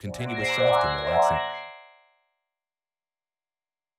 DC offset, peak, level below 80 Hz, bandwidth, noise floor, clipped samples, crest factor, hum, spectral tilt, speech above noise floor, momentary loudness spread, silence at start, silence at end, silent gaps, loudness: under 0.1%; -10 dBFS; -52 dBFS; 15.5 kHz; under -90 dBFS; under 0.1%; 18 dB; none; -4.5 dB/octave; over 66 dB; 14 LU; 0.05 s; 2.15 s; none; -24 LUFS